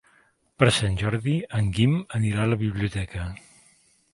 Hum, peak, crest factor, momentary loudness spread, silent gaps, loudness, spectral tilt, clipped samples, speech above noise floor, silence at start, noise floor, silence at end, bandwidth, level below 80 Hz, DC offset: none; 0 dBFS; 24 dB; 12 LU; none; -24 LUFS; -6 dB/octave; under 0.1%; 39 dB; 0.6 s; -62 dBFS; 0.8 s; 11.5 kHz; -44 dBFS; under 0.1%